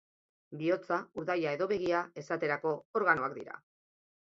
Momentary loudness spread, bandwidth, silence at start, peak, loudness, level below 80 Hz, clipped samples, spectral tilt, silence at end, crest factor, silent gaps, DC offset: 14 LU; 7.6 kHz; 0.5 s; -12 dBFS; -33 LUFS; -74 dBFS; under 0.1%; -6.5 dB/octave; 0.75 s; 22 dB; 2.85-2.94 s; under 0.1%